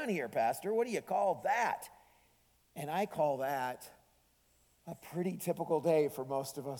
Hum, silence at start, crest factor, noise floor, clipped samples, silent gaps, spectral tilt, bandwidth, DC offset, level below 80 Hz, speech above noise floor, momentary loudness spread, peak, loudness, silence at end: none; 0 s; 18 dB; -71 dBFS; under 0.1%; none; -5.5 dB/octave; 19 kHz; under 0.1%; -76 dBFS; 36 dB; 18 LU; -18 dBFS; -35 LUFS; 0 s